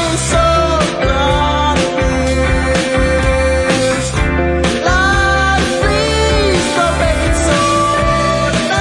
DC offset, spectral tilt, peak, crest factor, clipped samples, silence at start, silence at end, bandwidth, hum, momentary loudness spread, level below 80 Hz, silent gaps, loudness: under 0.1%; -4.5 dB/octave; 0 dBFS; 12 dB; under 0.1%; 0 s; 0 s; 11.5 kHz; none; 3 LU; -20 dBFS; none; -13 LUFS